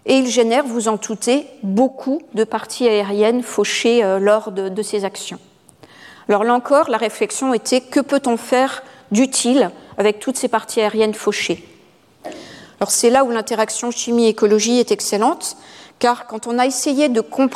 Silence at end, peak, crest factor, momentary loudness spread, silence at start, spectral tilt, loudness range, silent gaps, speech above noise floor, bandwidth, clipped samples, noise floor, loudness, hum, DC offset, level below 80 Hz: 0 s; -2 dBFS; 16 dB; 9 LU; 0.05 s; -3.5 dB/octave; 2 LU; none; 33 dB; 15 kHz; under 0.1%; -50 dBFS; -17 LUFS; none; under 0.1%; -64 dBFS